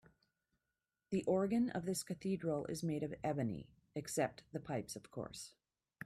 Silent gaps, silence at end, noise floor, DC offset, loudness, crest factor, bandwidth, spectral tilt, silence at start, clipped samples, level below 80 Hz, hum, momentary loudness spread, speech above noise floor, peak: none; 0.55 s; under -90 dBFS; under 0.1%; -41 LUFS; 18 dB; 15.5 kHz; -5.5 dB/octave; 1.1 s; under 0.1%; -72 dBFS; none; 13 LU; over 50 dB; -22 dBFS